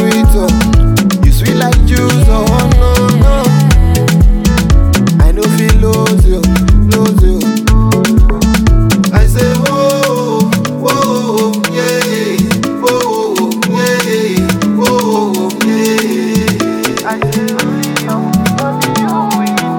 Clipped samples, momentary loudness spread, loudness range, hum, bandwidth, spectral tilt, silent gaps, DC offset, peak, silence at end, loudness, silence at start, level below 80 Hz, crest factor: 0.2%; 4 LU; 3 LU; none; 18.5 kHz; -5.5 dB/octave; none; under 0.1%; 0 dBFS; 0 s; -11 LUFS; 0 s; -14 dBFS; 8 dB